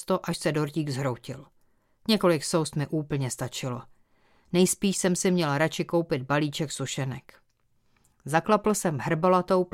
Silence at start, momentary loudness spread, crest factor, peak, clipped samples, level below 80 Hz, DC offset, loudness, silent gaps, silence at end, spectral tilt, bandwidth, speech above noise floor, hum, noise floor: 0 s; 12 LU; 20 dB; -8 dBFS; under 0.1%; -60 dBFS; under 0.1%; -26 LUFS; none; 0.05 s; -5 dB/octave; 16.5 kHz; 41 dB; none; -67 dBFS